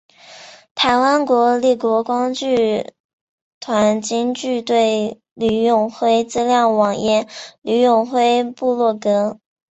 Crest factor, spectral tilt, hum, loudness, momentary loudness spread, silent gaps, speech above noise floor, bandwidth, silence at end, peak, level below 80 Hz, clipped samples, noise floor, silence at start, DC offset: 14 dB; -4.5 dB/octave; none; -17 LUFS; 8 LU; 0.71-0.75 s, 3.00-3.61 s, 5.31-5.36 s; 25 dB; 8.2 kHz; 0.35 s; -2 dBFS; -58 dBFS; under 0.1%; -41 dBFS; 0.3 s; under 0.1%